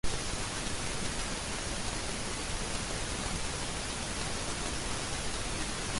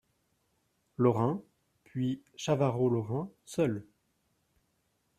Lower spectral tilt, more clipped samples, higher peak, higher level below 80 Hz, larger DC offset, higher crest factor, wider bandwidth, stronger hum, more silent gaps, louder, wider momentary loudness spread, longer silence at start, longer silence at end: second, -2.5 dB/octave vs -7.5 dB/octave; neither; second, -18 dBFS vs -12 dBFS; first, -42 dBFS vs -70 dBFS; neither; second, 16 dB vs 22 dB; second, 11.5 kHz vs 13.5 kHz; neither; neither; second, -35 LUFS vs -32 LUFS; second, 1 LU vs 13 LU; second, 0.05 s vs 1 s; second, 0 s vs 1.35 s